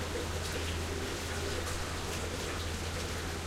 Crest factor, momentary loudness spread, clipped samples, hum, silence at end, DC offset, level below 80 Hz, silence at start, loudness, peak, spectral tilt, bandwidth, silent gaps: 14 dB; 1 LU; under 0.1%; none; 0 s; under 0.1%; -44 dBFS; 0 s; -36 LUFS; -22 dBFS; -3.5 dB/octave; 16 kHz; none